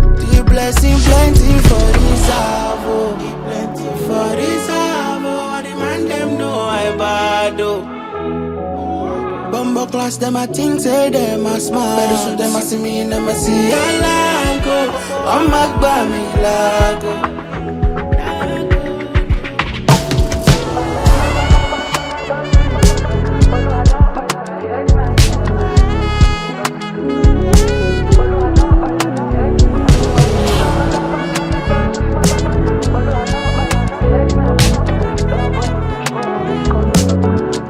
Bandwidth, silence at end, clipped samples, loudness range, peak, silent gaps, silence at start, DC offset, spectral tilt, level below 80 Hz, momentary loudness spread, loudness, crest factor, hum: 16 kHz; 0 s; under 0.1%; 5 LU; 0 dBFS; none; 0 s; under 0.1%; -5.5 dB/octave; -18 dBFS; 8 LU; -15 LUFS; 12 dB; none